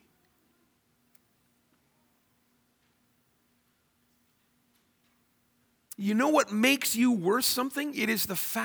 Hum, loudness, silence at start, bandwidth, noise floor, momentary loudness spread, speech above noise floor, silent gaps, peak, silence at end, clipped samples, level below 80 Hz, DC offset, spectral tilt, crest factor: none; -26 LUFS; 6 s; over 20 kHz; -71 dBFS; 7 LU; 44 dB; none; -10 dBFS; 0 s; under 0.1%; -74 dBFS; under 0.1%; -3 dB/octave; 22 dB